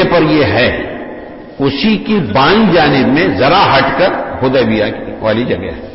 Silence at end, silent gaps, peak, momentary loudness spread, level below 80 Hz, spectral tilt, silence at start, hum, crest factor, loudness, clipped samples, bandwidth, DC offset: 0 s; none; 0 dBFS; 11 LU; -36 dBFS; -9.5 dB/octave; 0 s; none; 10 dB; -11 LUFS; under 0.1%; 5.8 kHz; under 0.1%